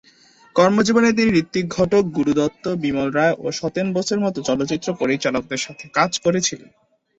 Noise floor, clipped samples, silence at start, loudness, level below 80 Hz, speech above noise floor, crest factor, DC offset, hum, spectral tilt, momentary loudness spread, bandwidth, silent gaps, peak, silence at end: -52 dBFS; under 0.1%; 0.55 s; -20 LUFS; -52 dBFS; 33 dB; 18 dB; under 0.1%; none; -4.5 dB/octave; 8 LU; 8.2 kHz; none; -2 dBFS; 0.6 s